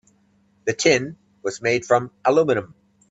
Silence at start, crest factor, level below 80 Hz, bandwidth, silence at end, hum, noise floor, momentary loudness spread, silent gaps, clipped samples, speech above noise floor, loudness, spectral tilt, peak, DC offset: 0.65 s; 20 dB; -62 dBFS; 8 kHz; 0.45 s; none; -61 dBFS; 12 LU; none; under 0.1%; 41 dB; -21 LUFS; -4 dB/octave; -2 dBFS; under 0.1%